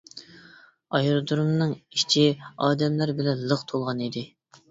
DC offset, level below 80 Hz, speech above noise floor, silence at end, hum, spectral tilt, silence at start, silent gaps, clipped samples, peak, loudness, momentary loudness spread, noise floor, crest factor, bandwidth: under 0.1%; -64 dBFS; 29 dB; 0.45 s; none; -5.5 dB/octave; 0.15 s; none; under 0.1%; -6 dBFS; -25 LUFS; 12 LU; -53 dBFS; 18 dB; 7.8 kHz